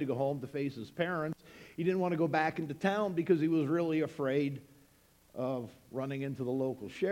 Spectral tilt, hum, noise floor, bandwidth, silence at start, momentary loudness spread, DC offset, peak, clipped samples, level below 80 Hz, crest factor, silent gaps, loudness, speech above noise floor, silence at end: -7.5 dB/octave; none; -65 dBFS; 16 kHz; 0 s; 10 LU; under 0.1%; -16 dBFS; under 0.1%; -72 dBFS; 18 dB; none; -34 LUFS; 32 dB; 0 s